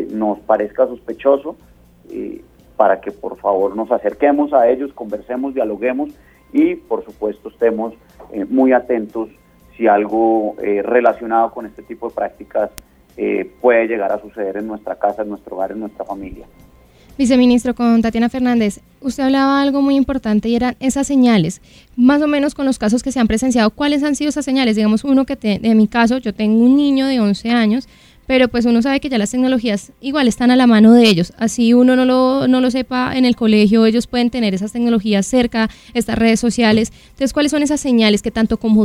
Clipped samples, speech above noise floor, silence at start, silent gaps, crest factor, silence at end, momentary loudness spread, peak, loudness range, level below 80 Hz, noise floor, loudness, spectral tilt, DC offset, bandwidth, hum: under 0.1%; 31 dB; 0 s; none; 16 dB; 0 s; 13 LU; 0 dBFS; 7 LU; -44 dBFS; -46 dBFS; -15 LUFS; -5.5 dB/octave; under 0.1%; 13.5 kHz; none